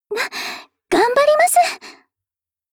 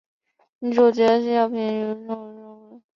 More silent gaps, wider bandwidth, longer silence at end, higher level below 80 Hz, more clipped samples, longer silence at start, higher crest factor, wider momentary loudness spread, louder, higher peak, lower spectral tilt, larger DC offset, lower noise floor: neither; first, over 20 kHz vs 7.2 kHz; first, 0.8 s vs 0.2 s; first, -58 dBFS vs -72 dBFS; neither; second, 0.1 s vs 0.6 s; second, 14 dB vs 20 dB; about the same, 17 LU vs 17 LU; first, -16 LUFS vs -21 LUFS; about the same, -4 dBFS vs -4 dBFS; second, -1.5 dB/octave vs -6.5 dB/octave; neither; first, -90 dBFS vs -44 dBFS